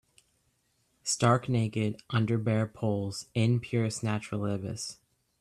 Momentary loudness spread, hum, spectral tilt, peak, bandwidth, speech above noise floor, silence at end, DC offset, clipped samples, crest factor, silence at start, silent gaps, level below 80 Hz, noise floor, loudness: 9 LU; none; -5.5 dB/octave; -12 dBFS; 12.5 kHz; 44 dB; 0.45 s; under 0.1%; under 0.1%; 20 dB; 1.05 s; none; -64 dBFS; -73 dBFS; -30 LUFS